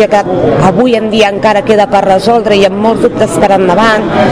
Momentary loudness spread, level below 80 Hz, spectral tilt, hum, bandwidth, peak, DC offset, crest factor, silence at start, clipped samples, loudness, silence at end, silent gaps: 2 LU; -36 dBFS; -5.5 dB/octave; none; 11 kHz; 0 dBFS; under 0.1%; 8 dB; 0 s; 5%; -8 LUFS; 0 s; none